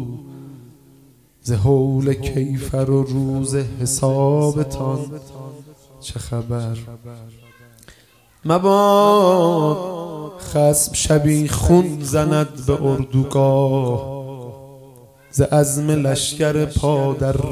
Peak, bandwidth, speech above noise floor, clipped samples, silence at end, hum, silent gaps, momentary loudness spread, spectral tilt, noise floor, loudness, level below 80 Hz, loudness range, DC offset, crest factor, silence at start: 0 dBFS; 15.5 kHz; 35 dB; under 0.1%; 0 s; none; none; 18 LU; -6 dB/octave; -52 dBFS; -18 LUFS; -36 dBFS; 8 LU; under 0.1%; 18 dB; 0 s